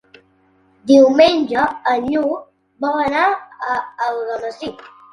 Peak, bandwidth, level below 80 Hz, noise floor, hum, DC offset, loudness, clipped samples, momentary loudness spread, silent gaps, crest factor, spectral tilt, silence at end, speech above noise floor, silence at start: 0 dBFS; 10.5 kHz; -56 dBFS; -56 dBFS; none; under 0.1%; -17 LUFS; under 0.1%; 16 LU; none; 18 dB; -4.5 dB/octave; 0.25 s; 40 dB; 0.85 s